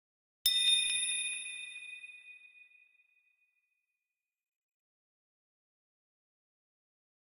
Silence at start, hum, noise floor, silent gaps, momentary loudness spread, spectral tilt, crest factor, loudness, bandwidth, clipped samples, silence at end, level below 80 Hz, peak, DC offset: 0.45 s; none; under -90 dBFS; none; 22 LU; 5.5 dB/octave; 26 dB; -30 LUFS; 16 kHz; under 0.1%; 4.6 s; -82 dBFS; -14 dBFS; under 0.1%